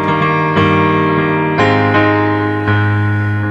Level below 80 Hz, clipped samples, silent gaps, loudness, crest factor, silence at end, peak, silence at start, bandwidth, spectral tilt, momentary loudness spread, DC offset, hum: -42 dBFS; under 0.1%; none; -13 LUFS; 12 dB; 0 s; 0 dBFS; 0 s; 8 kHz; -8 dB/octave; 3 LU; under 0.1%; none